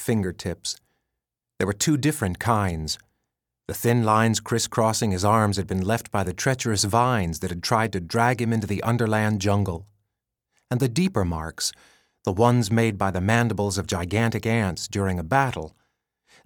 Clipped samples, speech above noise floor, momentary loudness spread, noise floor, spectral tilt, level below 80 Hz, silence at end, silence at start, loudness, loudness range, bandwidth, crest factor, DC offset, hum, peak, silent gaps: under 0.1%; 61 dB; 9 LU; -84 dBFS; -5 dB/octave; -48 dBFS; 0.75 s; 0 s; -24 LUFS; 3 LU; 18.5 kHz; 20 dB; under 0.1%; none; -4 dBFS; none